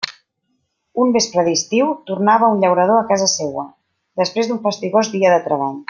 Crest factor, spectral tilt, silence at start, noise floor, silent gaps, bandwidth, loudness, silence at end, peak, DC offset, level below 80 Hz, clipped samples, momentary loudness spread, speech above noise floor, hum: 16 dB; -3.5 dB/octave; 0 s; -69 dBFS; none; 10.5 kHz; -16 LUFS; 0.1 s; -2 dBFS; under 0.1%; -66 dBFS; under 0.1%; 12 LU; 53 dB; none